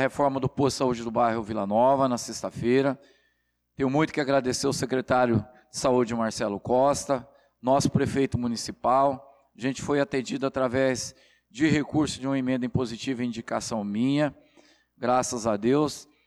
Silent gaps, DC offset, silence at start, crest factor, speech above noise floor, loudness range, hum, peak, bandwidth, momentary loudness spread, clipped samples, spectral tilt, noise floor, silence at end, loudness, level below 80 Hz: none; under 0.1%; 0 s; 14 dB; 48 dB; 2 LU; none; -12 dBFS; 13.5 kHz; 8 LU; under 0.1%; -5.5 dB/octave; -73 dBFS; 0.25 s; -26 LUFS; -54 dBFS